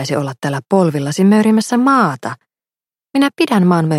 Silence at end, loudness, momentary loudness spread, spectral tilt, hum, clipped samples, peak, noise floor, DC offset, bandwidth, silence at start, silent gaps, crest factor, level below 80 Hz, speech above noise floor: 0 s; -14 LUFS; 10 LU; -6.5 dB/octave; none; under 0.1%; 0 dBFS; under -90 dBFS; under 0.1%; 14 kHz; 0 s; none; 14 dB; -62 dBFS; over 76 dB